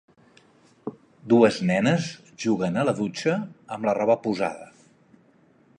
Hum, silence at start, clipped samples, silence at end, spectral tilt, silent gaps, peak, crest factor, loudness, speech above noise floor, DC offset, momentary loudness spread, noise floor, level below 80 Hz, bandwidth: none; 0.85 s; under 0.1%; 1.15 s; -6 dB/octave; none; -4 dBFS; 22 dB; -24 LUFS; 36 dB; under 0.1%; 20 LU; -59 dBFS; -66 dBFS; 10.5 kHz